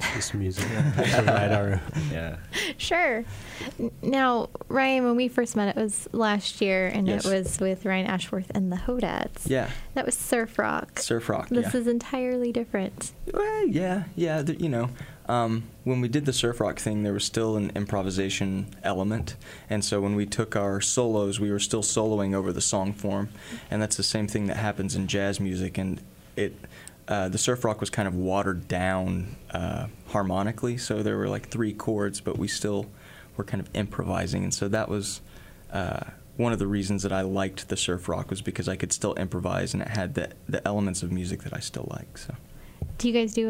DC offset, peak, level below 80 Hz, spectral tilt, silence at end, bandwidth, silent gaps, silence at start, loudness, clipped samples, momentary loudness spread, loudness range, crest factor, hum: under 0.1%; -8 dBFS; -48 dBFS; -4.5 dB/octave; 0 s; 16 kHz; none; 0 s; -27 LUFS; under 0.1%; 9 LU; 4 LU; 18 dB; none